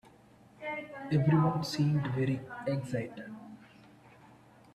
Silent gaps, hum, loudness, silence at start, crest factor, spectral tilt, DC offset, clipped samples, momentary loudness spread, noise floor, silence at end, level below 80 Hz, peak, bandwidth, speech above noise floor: none; none; -32 LUFS; 0.6 s; 18 dB; -7.5 dB/octave; under 0.1%; under 0.1%; 19 LU; -59 dBFS; 0.65 s; -66 dBFS; -14 dBFS; 13 kHz; 29 dB